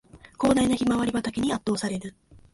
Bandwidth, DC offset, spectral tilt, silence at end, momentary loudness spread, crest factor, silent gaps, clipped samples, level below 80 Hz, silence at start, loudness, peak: 11.5 kHz; under 0.1%; -5 dB/octave; 0.45 s; 10 LU; 16 dB; none; under 0.1%; -50 dBFS; 0.15 s; -25 LUFS; -10 dBFS